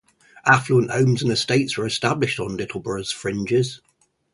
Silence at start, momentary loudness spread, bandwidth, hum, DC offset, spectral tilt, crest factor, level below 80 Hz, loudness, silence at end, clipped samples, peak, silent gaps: 0.35 s; 10 LU; 11.5 kHz; none; under 0.1%; -5 dB/octave; 22 dB; -54 dBFS; -21 LUFS; 0.55 s; under 0.1%; 0 dBFS; none